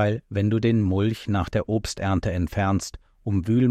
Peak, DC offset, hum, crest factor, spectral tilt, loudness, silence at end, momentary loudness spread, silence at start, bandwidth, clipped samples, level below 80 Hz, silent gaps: -10 dBFS; under 0.1%; none; 12 dB; -7 dB/octave; -24 LUFS; 0 s; 6 LU; 0 s; 13.5 kHz; under 0.1%; -42 dBFS; none